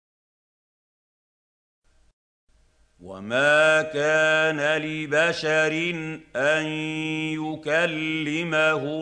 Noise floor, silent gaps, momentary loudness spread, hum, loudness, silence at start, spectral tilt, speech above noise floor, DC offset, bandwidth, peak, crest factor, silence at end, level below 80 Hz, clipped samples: -60 dBFS; none; 9 LU; none; -22 LUFS; 3 s; -4.5 dB/octave; 37 dB; under 0.1%; 9.8 kHz; -8 dBFS; 18 dB; 0 s; -66 dBFS; under 0.1%